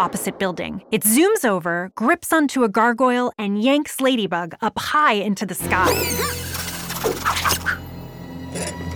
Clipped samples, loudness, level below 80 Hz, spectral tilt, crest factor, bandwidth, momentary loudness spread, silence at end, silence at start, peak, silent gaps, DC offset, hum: under 0.1%; -20 LUFS; -46 dBFS; -3.5 dB/octave; 16 dB; over 20 kHz; 11 LU; 0 s; 0 s; -4 dBFS; none; under 0.1%; none